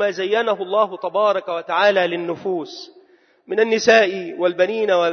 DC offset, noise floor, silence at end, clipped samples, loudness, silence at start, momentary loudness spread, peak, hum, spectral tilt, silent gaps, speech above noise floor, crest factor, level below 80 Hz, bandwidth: under 0.1%; -53 dBFS; 0 s; under 0.1%; -19 LUFS; 0 s; 11 LU; -2 dBFS; none; -3.5 dB/octave; none; 35 dB; 16 dB; -70 dBFS; 6.6 kHz